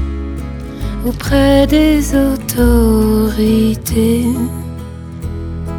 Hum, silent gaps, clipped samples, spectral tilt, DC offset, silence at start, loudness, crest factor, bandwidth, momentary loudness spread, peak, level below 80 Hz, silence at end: none; none; under 0.1%; -6 dB/octave; under 0.1%; 0 s; -14 LUFS; 14 dB; 18.5 kHz; 15 LU; 0 dBFS; -22 dBFS; 0 s